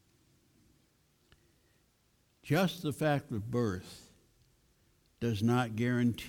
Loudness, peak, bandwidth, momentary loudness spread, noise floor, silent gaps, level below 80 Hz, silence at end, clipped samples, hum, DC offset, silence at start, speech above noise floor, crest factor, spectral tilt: -33 LUFS; -18 dBFS; 18 kHz; 14 LU; -72 dBFS; none; -66 dBFS; 0 s; under 0.1%; none; under 0.1%; 2.45 s; 40 dB; 18 dB; -6.5 dB/octave